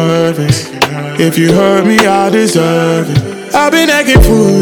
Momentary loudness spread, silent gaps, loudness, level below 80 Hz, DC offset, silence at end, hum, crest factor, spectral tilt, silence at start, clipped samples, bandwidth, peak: 7 LU; none; -9 LUFS; -20 dBFS; under 0.1%; 0 s; none; 8 dB; -5 dB/octave; 0 s; 3%; over 20 kHz; 0 dBFS